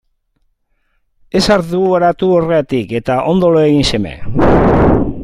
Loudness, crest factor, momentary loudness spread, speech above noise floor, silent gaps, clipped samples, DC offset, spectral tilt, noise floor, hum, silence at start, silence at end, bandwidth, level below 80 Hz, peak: -12 LUFS; 12 dB; 7 LU; 49 dB; none; under 0.1%; under 0.1%; -6.5 dB/octave; -61 dBFS; none; 1.35 s; 0 s; 14 kHz; -28 dBFS; 0 dBFS